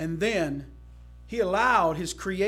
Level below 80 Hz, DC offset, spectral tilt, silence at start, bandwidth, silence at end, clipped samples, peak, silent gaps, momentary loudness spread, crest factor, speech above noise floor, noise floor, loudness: -48 dBFS; under 0.1%; -4.5 dB/octave; 0 s; 16.5 kHz; 0 s; under 0.1%; -8 dBFS; none; 12 LU; 18 dB; 21 dB; -47 dBFS; -26 LUFS